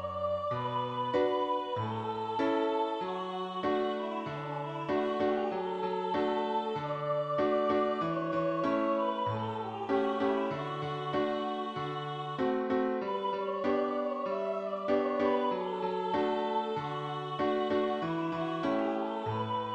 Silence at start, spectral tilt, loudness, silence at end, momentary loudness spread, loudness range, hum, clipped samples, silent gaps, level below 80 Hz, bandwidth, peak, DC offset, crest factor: 0 s; -7.5 dB/octave; -32 LUFS; 0 s; 6 LU; 2 LU; none; under 0.1%; none; -68 dBFS; 8.2 kHz; -16 dBFS; under 0.1%; 16 dB